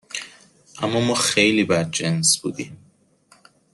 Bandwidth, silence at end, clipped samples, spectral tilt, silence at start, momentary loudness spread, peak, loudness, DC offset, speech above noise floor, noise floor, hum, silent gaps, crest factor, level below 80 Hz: 12.5 kHz; 1 s; under 0.1%; -3 dB/octave; 0.1 s; 17 LU; -4 dBFS; -19 LUFS; under 0.1%; 37 dB; -58 dBFS; none; none; 20 dB; -60 dBFS